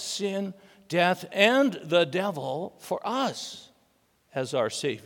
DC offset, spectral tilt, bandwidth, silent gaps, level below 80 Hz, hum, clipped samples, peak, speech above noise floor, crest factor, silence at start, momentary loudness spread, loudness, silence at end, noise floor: under 0.1%; -4 dB/octave; 18 kHz; none; -80 dBFS; none; under 0.1%; -4 dBFS; 41 dB; 22 dB; 0 s; 15 LU; -27 LUFS; 0.05 s; -67 dBFS